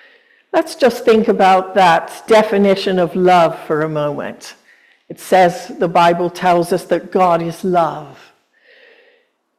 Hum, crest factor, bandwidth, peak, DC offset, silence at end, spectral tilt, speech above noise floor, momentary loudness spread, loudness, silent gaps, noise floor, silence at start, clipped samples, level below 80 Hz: none; 14 dB; 15 kHz; -2 dBFS; under 0.1%; 1.45 s; -5.5 dB/octave; 43 dB; 9 LU; -14 LUFS; none; -57 dBFS; 0.55 s; under 0.1%; -58 dBFS